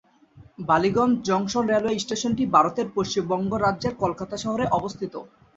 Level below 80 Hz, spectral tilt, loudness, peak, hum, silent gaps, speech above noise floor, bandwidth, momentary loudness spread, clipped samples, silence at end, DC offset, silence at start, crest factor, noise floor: -54 dBFS; -5 dB/octave; -24 LUFS; -4 dBFS; none; none; 28 dB; 8 kHz; 11 LU; under 0.1%; 0.3 s; under 0.1%; 0.35 s; 20 dB; -52 dBFS